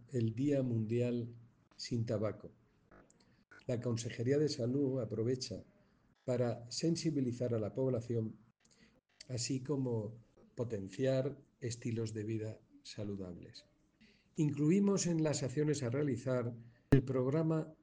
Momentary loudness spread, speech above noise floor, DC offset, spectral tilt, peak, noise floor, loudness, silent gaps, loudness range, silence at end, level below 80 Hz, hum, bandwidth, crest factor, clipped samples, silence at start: 15 LU; 35 dB; under 0.1%; -6.5 dB/octave; -12 dBFS; -71 dBFS; -37 LUFS; none; 6 LU; 0.1 s; -64 dBFS; none; 10 kHz; 24 dB; under 0.1%; 0 s